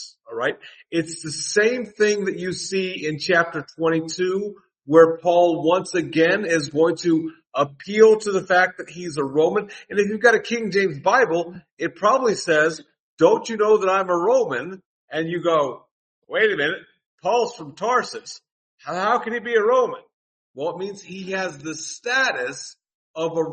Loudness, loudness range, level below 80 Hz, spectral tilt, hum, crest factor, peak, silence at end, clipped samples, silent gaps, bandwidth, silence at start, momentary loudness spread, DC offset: -21 LUFS; 5 LU; -68 dBFS; -4 dB/octave; none; 20 dB; 0 dBFS; 0 s; under 0.1%; 11.72-11.77 s, 13.00-13.17 s, 14.85-15.08 s, 15.91-16.22 s, 17.06-17.18 s, 18.52-18.78 s, 20.13-20.54 s, 22.95-23.14 s; 8.8 kHz; 0 s; 13 LU; under 0.1%